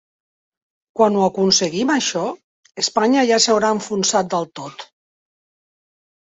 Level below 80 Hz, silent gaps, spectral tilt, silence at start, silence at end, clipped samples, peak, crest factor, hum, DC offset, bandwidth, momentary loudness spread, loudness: -64 dBFS; 2.44-2.63 s; -3 dB/octave; 0.95 s; 1.55 s; under 0.1%; -2 dBFS; 18 dB; none; under 0.1%; 8.4 kHz; 19 LU; -17 LUFS